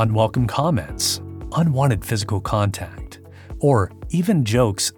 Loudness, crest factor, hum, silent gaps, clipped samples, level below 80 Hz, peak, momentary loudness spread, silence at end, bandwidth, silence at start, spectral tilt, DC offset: -20 LUFS; 16 dB; none; none; under 0.1%; -40 dBFS; -4 dBFS; 11 LU; 0.05 s; 19 kHz; 0 s; -5.5 dB/octave; under 0.1%